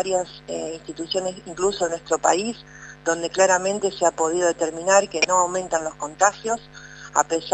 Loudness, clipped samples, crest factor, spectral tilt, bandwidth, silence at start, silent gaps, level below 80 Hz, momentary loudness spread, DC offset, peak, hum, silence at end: -22 LUFS; under 0.1%; 22 dB; -2 dB/octave; 9.2 kHz; 0 s; none; -56 dBFS; 12 LU; under 0.1%; 0 dBFS; 50 Hz at -50 dBFS; 0 s